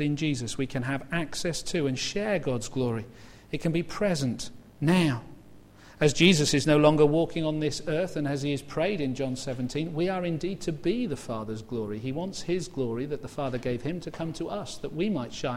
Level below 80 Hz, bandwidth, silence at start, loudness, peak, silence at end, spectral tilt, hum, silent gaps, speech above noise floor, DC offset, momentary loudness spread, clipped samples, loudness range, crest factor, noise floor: -50 dBFS; 15.5 kHz; 0 s; -28 LUFS; -6 dBFS; 0 s; -5 dB/octave; none; none; 23 dB; under 0.1%; 13 LU; under 0.1%; 8 LU; 22 dB; -51 dBFS